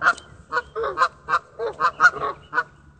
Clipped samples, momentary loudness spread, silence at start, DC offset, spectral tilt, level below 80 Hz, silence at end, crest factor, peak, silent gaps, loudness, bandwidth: under 0.1%; 12 LU; 0 s; under 0.1%; -2.5 dB/octave; -54 dBFS; 0.35 s; 20 dB; -2 dBFS; none; -23 LUFS; 9 kHz